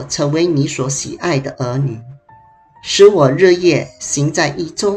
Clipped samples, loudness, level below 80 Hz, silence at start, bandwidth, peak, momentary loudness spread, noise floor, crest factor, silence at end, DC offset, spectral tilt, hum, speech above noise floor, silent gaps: under 0.1%; -14 LUFS; -50 dBFS; 0 s; 11 kHz; 0 dBFS; 11 LU; -46 dBFS; 14 dB; 0 s; under 0.1%; -5 dB/octave; none; 32 dB; none